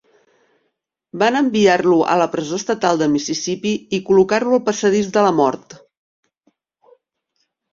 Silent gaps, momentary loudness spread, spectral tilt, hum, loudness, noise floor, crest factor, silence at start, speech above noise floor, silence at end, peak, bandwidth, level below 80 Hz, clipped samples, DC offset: none; 8 LU; -4.5 dB/octave; none; -17 LUFS; -72 dBFS; 18 dB; 1.15 s; 56 dB; 1.95 s; -2 dBFS; 7.6 kHz; -60 dBFS; under 0.1%; under 0.1%